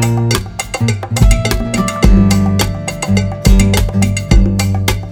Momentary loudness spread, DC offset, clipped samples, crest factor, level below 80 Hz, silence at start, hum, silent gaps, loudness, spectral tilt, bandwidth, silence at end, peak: 6 LU; under 0.1%; 0.7%; 12 dB; -16 dBFS; 0 s; none; none; -13 LUFS; -5.5 dB/octave; 17.5 kHz; 0 s; 0 dBFS